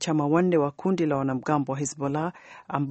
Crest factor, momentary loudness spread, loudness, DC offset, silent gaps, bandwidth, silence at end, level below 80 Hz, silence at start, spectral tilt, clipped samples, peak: 16 dB; 10 LU; -26 LUFS; under 0.1%; none; 8.4 kHz; 0 s; -64 dBFS; 0 s; -6 dB/octave; under 0.1%; -8 dBFS